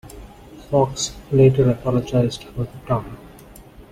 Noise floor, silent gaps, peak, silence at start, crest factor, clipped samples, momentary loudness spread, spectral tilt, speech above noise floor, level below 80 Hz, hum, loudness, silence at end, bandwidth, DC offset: -43 dBFS; none; -4 dBFS; 0.05 s; 18 dB; under 0.1%; 16 LU; -6.5 dB/octave; 24 dB; -42 dBFS; none; -20 LUFS; 0.1 s; 14 kHz; under 0.1%